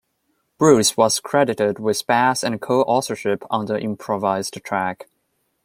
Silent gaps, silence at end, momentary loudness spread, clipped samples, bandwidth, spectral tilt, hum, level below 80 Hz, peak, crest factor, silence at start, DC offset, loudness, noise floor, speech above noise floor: none; 0.6 s; 10 LU; under 0.1%; 16.5 kHz; -4 dB/octave; none; -62 dBFS; -2 dBFS; 18 dB; 0.6 s; under 0.1%; -20 LUFS; -70 dBFS; 51 dB